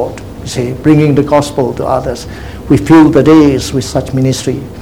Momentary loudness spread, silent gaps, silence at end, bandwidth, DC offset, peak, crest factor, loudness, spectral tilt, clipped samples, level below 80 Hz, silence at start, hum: 15 LU; none; 0 s; 19 kHz; 0.8%; 0 dBFS; 10 dB; -10 LUFS; -6.5 dB/octave; 1%; -30 dBFS; 0 s; none